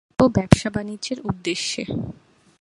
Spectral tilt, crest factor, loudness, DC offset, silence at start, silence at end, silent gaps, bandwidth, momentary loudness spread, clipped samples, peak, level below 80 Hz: -5.5 dB/octave; 22 dB; -22 LUFS; under 0.1%; 0.2 s; 0.5 s; none; 11.5 kHz; 11 LU; under 0.1%; 0 dBFS; -40 dBFS